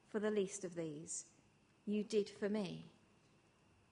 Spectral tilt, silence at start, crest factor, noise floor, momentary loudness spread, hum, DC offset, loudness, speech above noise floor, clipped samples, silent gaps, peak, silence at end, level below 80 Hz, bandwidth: -5 dB/octave; 0.15 s; 18 dB; -72 dBFS; 14 LU; none; under 0.1%; -42 LUFS; 30 dB; under 0.1%; none; -26 dBFS; 1 s; -82 dBFS; 10.5 kHz